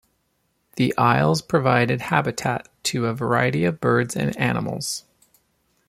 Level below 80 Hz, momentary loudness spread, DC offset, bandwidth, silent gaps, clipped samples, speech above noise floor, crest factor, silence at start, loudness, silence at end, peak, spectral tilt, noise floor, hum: -56 dBFS; 8 LU; under 0.1%; 15.5 kHz; none; under 0.1%; 48 dB; 20 dB; 0.75 s; -22 LUFS; 0.9 s; -2 dBFS; -5.5 dB/octave; -70 dBFS; none